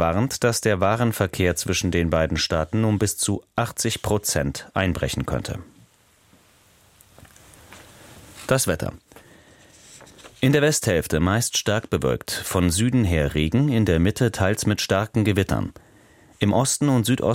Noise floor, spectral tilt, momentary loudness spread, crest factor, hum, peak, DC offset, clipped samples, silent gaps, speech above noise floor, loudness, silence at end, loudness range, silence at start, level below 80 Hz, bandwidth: -57 dBFS; -5 dB/octave; 6 LU; 20 dB; none; -4 dBFS; under 0.1%; under 0.1%; none; 36 dB; -22 LUFS; 0 s; 9 LU; 0 s; -40 dBFS; 16.5 kHz